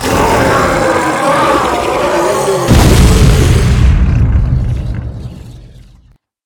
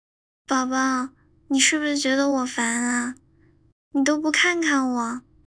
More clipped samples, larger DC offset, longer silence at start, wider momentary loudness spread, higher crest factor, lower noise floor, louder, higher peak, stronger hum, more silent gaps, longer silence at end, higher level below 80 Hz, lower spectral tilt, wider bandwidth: first, 0.4% vs under 0.1%; neither; second, 0 s vs 0.5 s; first, 13 LU vs 9 LU; second, 10 dB vs 18 dB; second, -46 dBFS vs -58 dBFS; first, -10 LUFS vs -22 LUFS; first, 0 dBFS vs -6 dBFS; neither; second, none vs 3.72-3.91 s; first, 0.8 s vs 0.3 s; first, -14 dBFS vs -64 dBFS; first, -5.5 dB/octave vs -1 dB/octave; first, 19.5 kHz vs 10.5 kHz